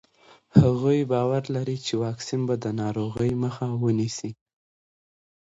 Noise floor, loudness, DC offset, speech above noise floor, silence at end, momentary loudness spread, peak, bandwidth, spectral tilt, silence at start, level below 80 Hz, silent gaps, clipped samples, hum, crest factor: -56 dBFS; -25 LUFS; under 0.1%; 32 dB; 1.25 s; 9 LU; -2 dBFS; 8 kHz; -7 dB/octave; 0.55 s; -52 dBFS; none; under 0.1%; none; 24 dB